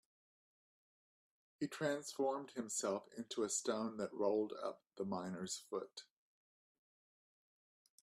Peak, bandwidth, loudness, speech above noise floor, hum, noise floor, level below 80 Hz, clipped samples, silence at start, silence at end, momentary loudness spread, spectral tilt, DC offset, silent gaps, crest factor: -26 dBFS; 15.5 kHz; -42 LUFS; over 48 dB; none; under -90 dBFS; -86 dBFS; under 0.1%; 1.6 s; 2 s; 9 LU; -3.5 dB/octave; under 0.1%; none; 20 dB